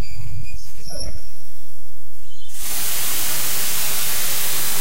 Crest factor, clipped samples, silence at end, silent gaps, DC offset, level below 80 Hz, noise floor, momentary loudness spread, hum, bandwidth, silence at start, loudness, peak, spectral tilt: 14 dB; under 0.1%; 0 s; none; 30%; -42 dBFS; -45 dBFS; 17 LU; none; 16 kHz; 0 s; -22 LUFS; -6 dBFS; -1 dB/octave